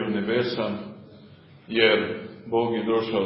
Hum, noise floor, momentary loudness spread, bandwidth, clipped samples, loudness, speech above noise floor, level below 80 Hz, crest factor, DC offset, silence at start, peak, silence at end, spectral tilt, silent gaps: none; -49 dBFS; 14 LU; 5.8 kHz; under 0.1%; -24 LUFS; 26 dB; -64 dBFS; 22 dB; under 0.1%; 0 s; -4 dBFS; 0 s; -9.5 dB/octave; none